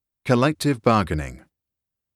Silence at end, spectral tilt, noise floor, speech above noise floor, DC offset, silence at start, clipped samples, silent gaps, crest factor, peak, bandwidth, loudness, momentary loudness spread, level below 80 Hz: 0.8 s; -6.5 dB/octave; -85 dBFS; 65 dB; under 0.1%; 0.25 s; under 0.1%; none; 18 dB; -4 dBFS; 14 kHz; -21 LUFS; 10 LU; -42 dBFS